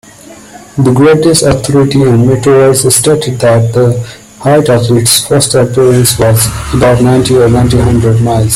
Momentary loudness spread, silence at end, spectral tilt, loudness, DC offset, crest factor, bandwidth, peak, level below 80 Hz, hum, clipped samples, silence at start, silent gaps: 4 LU; 0 s; -5 dB/octave; -7 LUFS; under 0.1%; 8 dB; 16.5 kHz; 0 dBFS; -30 dBFS; none; 0.2%; 0.25 s; none